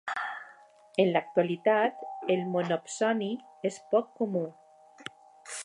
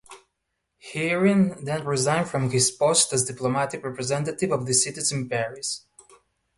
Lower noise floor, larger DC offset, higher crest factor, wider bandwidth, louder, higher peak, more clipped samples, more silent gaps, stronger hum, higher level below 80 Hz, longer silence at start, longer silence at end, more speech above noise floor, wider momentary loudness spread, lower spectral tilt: second, -55 dBFS vs -78 dBFS; neither; about the same, 20 dB vs 18 dB; about the same, 11.5 kHz vs 12 kHz; second, -30 LUFS vs -23 LUFS; second, -10 dBFS vs -6 dBFS; neither; neither; neither; second, -82 dBFS vs -60 dBFS; about the same, 0.05 s vs 0.1 s; second, 0 s vs 0.8 s; second, 27 dB vs 55 dB; first, 18 LU vs 10 LU; first, -5 dB/octave vs -3.5 dB/octave